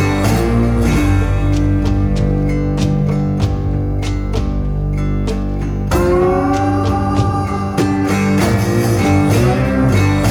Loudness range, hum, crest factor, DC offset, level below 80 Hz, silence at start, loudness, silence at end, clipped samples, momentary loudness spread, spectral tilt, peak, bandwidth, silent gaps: 3 LU; none; 12 dB; under 0.1%; -22 dBFS; 0 s; -15 LUFS; 0 s; under 0.1%; 6 LU; -7 dB/octave; -2 dBFS; 17.5 kHz; none